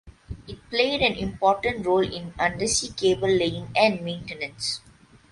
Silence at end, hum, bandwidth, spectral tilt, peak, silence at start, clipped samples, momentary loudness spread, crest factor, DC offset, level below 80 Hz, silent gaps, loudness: 0.55 s; none; 11.5 kHz; -3.5 dB/octave; -6 dBFS; 0.05 s; under 0.1%; 12 LU; 18 dB; under 0.1%; -48 dBFS; none; -24 LUFS